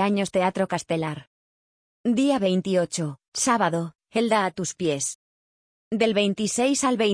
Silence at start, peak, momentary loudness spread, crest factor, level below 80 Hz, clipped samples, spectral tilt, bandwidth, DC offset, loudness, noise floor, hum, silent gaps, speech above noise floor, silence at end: 0 s; -8 dBFS; 9 LU; 16 dB; -64 dBFS; under 0.1%; -4 dB/octave; 10.5 kHz; under 0.1%; -24 LUFS; under -90 dBFS; none; 1.27-2.04 s, 3.28-3.32 s, 5.15-5.91 s; over 67 dB; 0 s